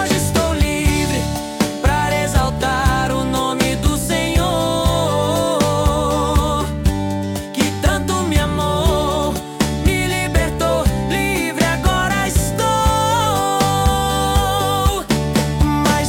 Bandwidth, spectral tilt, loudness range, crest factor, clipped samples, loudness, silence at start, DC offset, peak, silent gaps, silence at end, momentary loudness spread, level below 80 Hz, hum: 18 kHz; -4.5 dB/octave; 2 LU; 12 dB; under 0.1%; -17 LUFS; 0 s; under 0.1%; -4 dBFS; none; 0 s; 4 LU; -24 dBFS; none